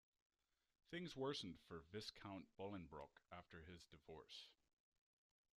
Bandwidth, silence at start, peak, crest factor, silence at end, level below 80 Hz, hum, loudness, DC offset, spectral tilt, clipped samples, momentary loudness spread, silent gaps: 13 kHz; 0.9 s; -36 dBFS; 20 dB; 1.05 s; -80 dBFS; none; -55 LUFS; under 0.1%; -5 dB/octave; under 0.1%; 14 LU; none